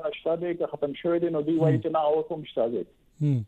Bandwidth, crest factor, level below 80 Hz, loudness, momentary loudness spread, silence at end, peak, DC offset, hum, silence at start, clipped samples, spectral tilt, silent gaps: 7.8 kHz; 14 dB; -64 dBFS; -27 LUFS; 7 LU; 0 s; -12 dBFS; under 0.1%; none; 0 s; under 0.1%; -9.5 dB/octave; none